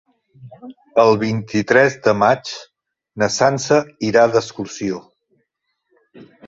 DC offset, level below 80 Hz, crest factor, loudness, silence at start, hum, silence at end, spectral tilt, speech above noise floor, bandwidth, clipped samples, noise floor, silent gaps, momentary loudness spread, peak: under 0.1%; -56 dBFS; 18 dB; -17 LUFS; 0.4 s; none; 0.25 s; -5 dB/octave; 56 dB; 8 kHz; under 0.1%; -73 dBFS; none; 12 LU; -2 dBFS